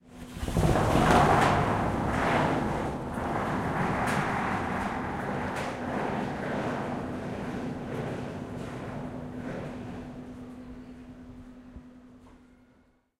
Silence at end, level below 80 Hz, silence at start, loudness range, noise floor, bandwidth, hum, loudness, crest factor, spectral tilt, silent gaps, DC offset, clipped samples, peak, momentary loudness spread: 0.8 s; -44 dBFS; 0.05 s; 16 LU; -64 dBFS; 16 kHz; none; -29 LUFS; 22 dB; -6 dB/octave; none; under 0.1%; under 0.1%; -8 dBFS; 21 LU